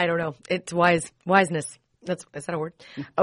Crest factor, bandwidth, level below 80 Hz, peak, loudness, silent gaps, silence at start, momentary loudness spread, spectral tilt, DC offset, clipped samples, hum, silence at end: 22 dB; 11 kHz; -62 dBFS; -4 dBFS; -25 LUFS; none; 0 s; 15 LU; -5 dB/octave; under 0.1%; under 0.1%; none; 0 s